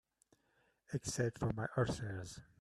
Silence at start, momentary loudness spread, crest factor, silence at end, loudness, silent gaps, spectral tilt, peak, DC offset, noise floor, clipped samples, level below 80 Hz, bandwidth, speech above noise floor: 0.9 s; 9 LU; 20 dB; 0.2 s; -40 LUFS; none; -5.5 dB/octave; -20 dBFS; under 0.1%; -77 dBFS; under 0.1%; -62 dBFS; 13 kHz; 38 dB